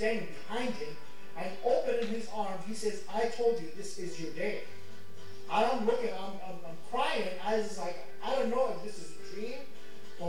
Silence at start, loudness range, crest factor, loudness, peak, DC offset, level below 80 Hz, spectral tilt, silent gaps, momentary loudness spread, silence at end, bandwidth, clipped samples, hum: 0 s; 2 LU; 18 dB; -34 LUFS; -16 dBFS; 2%; -76 dBFS; -4.5 dB/octave; none; 18 LU; 0 s; 17 kHz; under 0.1%; none